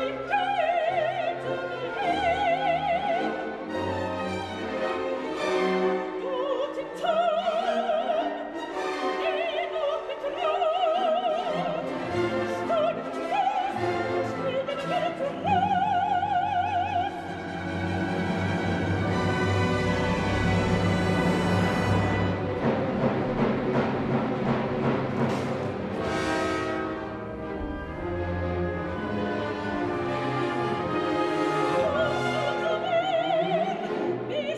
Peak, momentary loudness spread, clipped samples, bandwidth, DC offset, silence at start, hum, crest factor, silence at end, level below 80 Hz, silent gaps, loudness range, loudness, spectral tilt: -12 dBFS; 7 LU; under 0.1%; 12.5 kHz; under 0.1%; 0 s; none; 14 dB; 0 s; -48 dBFS; none; 4 LU; -27 LUFS; -6.5 dB/octave